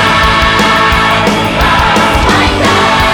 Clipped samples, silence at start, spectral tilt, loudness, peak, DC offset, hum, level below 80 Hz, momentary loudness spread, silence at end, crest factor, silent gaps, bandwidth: under 0.1%; 0 s; -4 dB/octave; -8 LUFS; 0 dBFS; under 0.1%; none; -20 dBFS; 2 LU; 0 s; 8 dB; none; 19 kHz